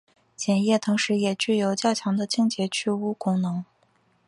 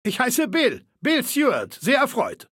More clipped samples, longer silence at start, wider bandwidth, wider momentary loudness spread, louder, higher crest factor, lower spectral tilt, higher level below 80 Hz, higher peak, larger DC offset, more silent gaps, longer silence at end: neither; first, 0.4 s vs 0.05 s; second, 11.5 kHz vs 17 kHz; about the same, 5 LU vs 5 LU; second, -24 LUFS vs -21 LUFS; about the same, 16 dB vs 16 dB; first, -5 dB/octave vs -3 dB/octave; about the same, -70 dBFS vs -68 dBFS; about the same, -8 dBFS vs -6 dBFS; neither; neither; first, 0.65 s vs 0.1 s